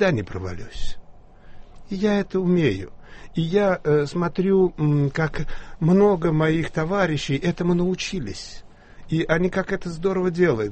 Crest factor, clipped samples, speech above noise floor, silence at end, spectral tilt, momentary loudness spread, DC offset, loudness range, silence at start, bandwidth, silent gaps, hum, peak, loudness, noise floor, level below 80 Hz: 16 dB; under 0.1%; 22 dB; 0 s; -7 dB/octave; 14 LU; under 0.1%; 4 LU; 0 s; 8.4 kHz; none; none; -4 dBFS; -22 LUFS; -44 dBFS; -38 dBFS